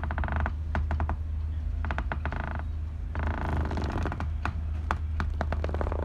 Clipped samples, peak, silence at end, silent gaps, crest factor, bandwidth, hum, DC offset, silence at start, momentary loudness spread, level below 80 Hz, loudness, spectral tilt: under 0.1%; -8 dBFS; 0 s; none; 22 dB; 7 kHz; none; under 0.1%; 0 s; 3 LU; -34 dBFS; -32 LUFS; -8 dB/octave